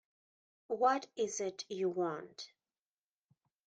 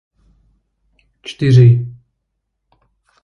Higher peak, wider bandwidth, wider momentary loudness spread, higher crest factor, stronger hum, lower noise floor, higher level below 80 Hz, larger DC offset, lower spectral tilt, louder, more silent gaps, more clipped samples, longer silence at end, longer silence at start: second, -18 dBFS vs 0 dBFS; first, 9.4 kHz vs 6.8 kHz; second, 18 LU vs 23 LU; first, 22 dB vs 16 dB; neither; first, under -90 dBFS vs -73 dBFS; second, -88 dBFS vs -50 dBFS; neither; second, -3.5 dB/octave vs -8.5 dB/octave; second, -36 LUFS vs -12 LUFS; neither; neither; about the same, 1.2 s vs 1.3 s; second, 0.7 s vs 1.25 s